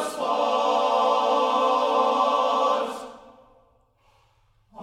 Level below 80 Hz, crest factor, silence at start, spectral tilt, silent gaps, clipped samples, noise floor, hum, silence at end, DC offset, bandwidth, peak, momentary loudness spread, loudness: -68 dBFS; 16 dB; 0 s; -2.5 dB/octave; none; under 0.1%; -63 dBFS; none; 0 s; under 0.1%; 15 kHz; -10 dBFS; 6 LU; -22 LUFS